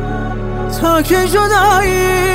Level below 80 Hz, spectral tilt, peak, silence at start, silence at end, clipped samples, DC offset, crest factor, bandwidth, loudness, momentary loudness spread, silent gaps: -24 dBFS; -4.5 dB/octave; -2 dBFS; 0 s; 0 s; under 0.1%; under 0.1%; 12 dB; 16.5 kHz; -13 LUFS; 11 LU; none